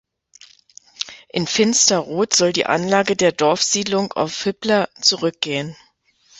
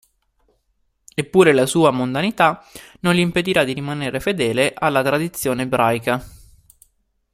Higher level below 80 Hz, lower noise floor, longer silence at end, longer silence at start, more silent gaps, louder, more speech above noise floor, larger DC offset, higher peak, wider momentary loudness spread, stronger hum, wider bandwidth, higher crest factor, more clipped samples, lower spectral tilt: second, -60 dBFS vs -52 dBFS; second, -58 dBFS vs -67 dBFS; second, 0.65 s vs 0.95 s; second, 1 s vs 1.15 s; neither; about the same, -18 LUFS vs -18 LUFS; second, 39 dB vs 49 dB; neither; about the same, 0 dBFS vs 0 dBFS; about the same, 10 LU vs 10 LU; neither; second, 8.4 kHz vs 16 kHz; about the same, 20 dB vs 18 dB; neither; second, -2.5 dB/octave vs -5 dB/octave